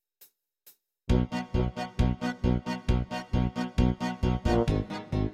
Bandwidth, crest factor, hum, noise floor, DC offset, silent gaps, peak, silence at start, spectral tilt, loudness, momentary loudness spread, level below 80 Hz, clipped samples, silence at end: 15.5 kHz; 16 dB; none; -61 dBFS; under 0.1%; none; -12 dBFS; 0.65 s; -7.5 dB/octave; -29 LUFS; 5 LU; -34 dBFS; under 0.1%; 0 s